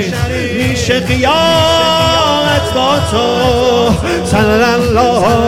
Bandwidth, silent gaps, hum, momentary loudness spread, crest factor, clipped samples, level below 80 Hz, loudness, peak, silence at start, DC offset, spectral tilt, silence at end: 16.5 kHz; none; none; 5 LU; 10 dB; under 0.1%; -30 dBFS; -11 LUFS; 0 dBFS; 0 s; 0.6%; -4.5 dB/octave; 0 s